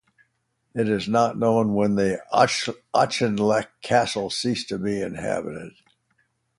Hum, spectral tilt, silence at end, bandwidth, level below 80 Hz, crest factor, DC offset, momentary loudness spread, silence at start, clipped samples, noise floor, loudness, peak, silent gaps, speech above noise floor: none; -5 dB/octave; 0.9 s; 11.5 kHz; -58 dBFS; 22 dB; under 0.1%; 7 LU; 0.75 s; under 0.1%; -72 dBFS; -23 LUFS; -2 dBFS; none; 49 dB